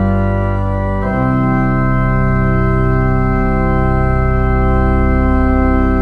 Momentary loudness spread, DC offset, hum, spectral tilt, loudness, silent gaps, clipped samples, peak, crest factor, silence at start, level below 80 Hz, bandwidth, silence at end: 3 LU; under 0.1%; none; -10.5 dB/octave; -14 LUFS; none; under 0.1%; 0 dBFS; 12 dB; 0 s; -16 dBFS; 4.8 kHz; 0 s